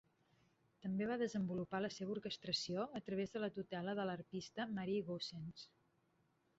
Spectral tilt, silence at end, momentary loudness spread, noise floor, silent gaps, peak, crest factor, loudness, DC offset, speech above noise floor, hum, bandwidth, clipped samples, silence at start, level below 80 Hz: -4.5 dB/octave; 0.9 s; 8 LU; -79 dBFS; none; -28 dBFS; 18 dB; -44 LUFS; under 0.1%; 36 dB; none; 8 kHz; under 0.1%; 0.8 s; -78 dBFS